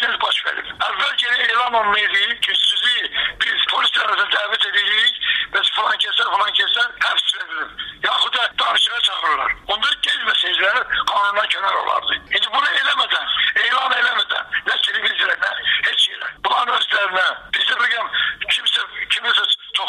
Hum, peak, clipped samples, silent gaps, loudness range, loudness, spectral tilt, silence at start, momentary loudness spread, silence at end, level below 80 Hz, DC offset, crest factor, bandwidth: none; -6 dBFS; under 0.1%; none; 2 LU; -17 LUFS; 0.5 dB/octave; 0 s; 5 LU; 0 s; -56 dBFS; under 0.1%; 14 dB; 15 kHz